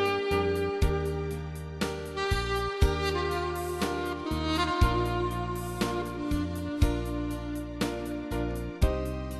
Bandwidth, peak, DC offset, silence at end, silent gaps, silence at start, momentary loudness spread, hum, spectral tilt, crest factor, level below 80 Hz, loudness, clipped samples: 13 kHz; -10 dBFS; under 0.1%; 0 s; none; 0 s; 7 LU; none; -6 dB/octave; 18 dB; -36 dBFS; -30 LUFS; under 0.1%